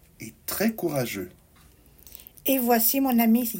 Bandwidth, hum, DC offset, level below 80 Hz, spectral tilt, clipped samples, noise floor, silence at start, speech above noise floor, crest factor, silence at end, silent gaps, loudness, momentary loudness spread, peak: 16.5 kHz; none; under 0.1%; -58 dBFS; -4.5 dB/octave; under 0.1%; -55 dBFS; 0.2 s; 32 dB; 18 dB; 0 s; none; -24 LUFS; 22 LU; -8 dBFS